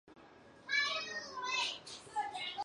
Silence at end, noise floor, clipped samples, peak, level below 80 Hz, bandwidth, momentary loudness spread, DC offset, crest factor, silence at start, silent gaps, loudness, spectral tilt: 0 s; -59 dBFS; under 0.1%; -20 dBFS; -76 dBFS; 11.5 kHz; 10 LU; under 0.1%; 20 dB; 0.05 s; none; -37 LUFS; 0 dB/octave